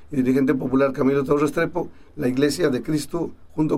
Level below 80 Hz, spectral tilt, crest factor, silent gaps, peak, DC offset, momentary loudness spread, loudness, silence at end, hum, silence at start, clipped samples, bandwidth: -48 dBFS; -6.5 dB/octave; 14 dB; none; -6 dBFS; under 0.1%; 9 LU; -22 LUFS; 0 s; none; 0 s; under 0.1%; 15 kHz